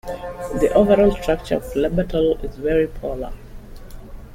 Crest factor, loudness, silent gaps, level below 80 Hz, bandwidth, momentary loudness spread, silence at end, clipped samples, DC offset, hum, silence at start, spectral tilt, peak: 16 dB; -20 LUFS; none; -34 dBFS; 16.5 kHz; 15 LU; 0 s; under 0.1%; under 0.1%; none; 0.05 s; -7 dB/octave; -4 dBFS